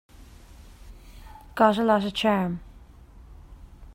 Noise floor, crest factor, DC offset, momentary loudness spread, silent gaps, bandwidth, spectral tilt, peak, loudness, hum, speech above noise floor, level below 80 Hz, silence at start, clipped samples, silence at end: -48 dBFS; 22 dB; under 0.1%; 15 LU; none; 16 kHz; -6 dB/octave; -6 dBFS; -23 LUFS; none; 26 dB; -48 dBFS; 0.2 s; under 0.1%; 0.05 s